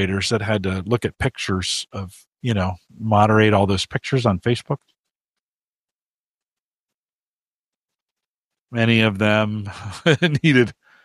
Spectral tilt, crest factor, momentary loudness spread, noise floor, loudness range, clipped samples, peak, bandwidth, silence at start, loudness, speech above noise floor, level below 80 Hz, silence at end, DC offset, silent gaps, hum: -5.5 dB/octave; 20 dB; 13 LU; under -90 dBFS; 8 LU; under 0.1%; -2 dBFS; 12.5 kHz; 0 s; -20 LUFS; over 71 dB; -50 dBFS; 0.3 s; under 0.1%; 5.11-5.34 s, 5.42-5.88 s, 5.95-6.38 s, 6.60-7.04 s, 7.12-7.70 s, 8.02-8.16 s, 8.26-8.51 s, 8.61-8.65 s; none